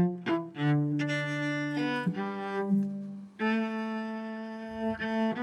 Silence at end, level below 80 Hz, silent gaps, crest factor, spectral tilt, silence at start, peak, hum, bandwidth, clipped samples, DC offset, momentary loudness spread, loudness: 0 s; -70 dBFS; none; 14 dB; -7.5 dB/octave; 0 s; -18 dBFS; none; 10.5 kHz; under 0.1%; under 0.1%; 9 LU; -31 LUFS